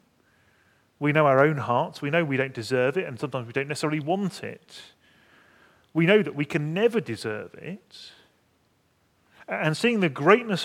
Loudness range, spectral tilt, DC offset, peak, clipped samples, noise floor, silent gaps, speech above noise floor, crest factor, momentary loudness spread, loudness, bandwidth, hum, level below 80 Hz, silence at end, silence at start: 6 LU; -6 dB/octave; under 0.1%; -2 dBFS; under 0.1%; -67 dBFS; none; 42 dB; 24 dB; 19 LU; -24 LUFS; 15 kHz; none; -74 dBFS; 0 s; 1 s